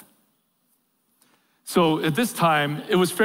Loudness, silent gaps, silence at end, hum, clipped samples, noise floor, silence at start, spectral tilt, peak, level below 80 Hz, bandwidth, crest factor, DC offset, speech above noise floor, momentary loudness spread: -22 LUFS; none; 0 s; none; under 0.1%; -69 dBFS; 1.65 s; -5 dB/octave; -8 dBFS; -64 dBFS; 16 kHz; 16 dB; under 0.1%; 48 dB; 4 LU